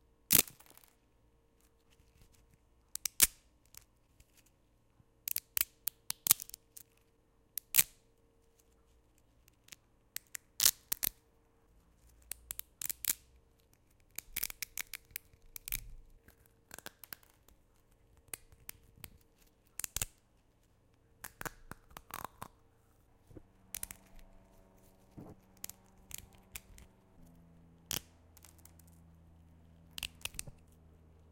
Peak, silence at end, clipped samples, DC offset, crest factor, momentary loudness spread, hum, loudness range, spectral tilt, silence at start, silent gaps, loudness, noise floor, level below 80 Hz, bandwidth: -4 dBFS; 0.8 s; under 0.1%; under 0.1%; 38 dB; 26 LU; none; 16 LU; 0 dB/octave; 0.3 s; none; -35 LUFS; -70 dBFS; -62 dBFS; 17 kHz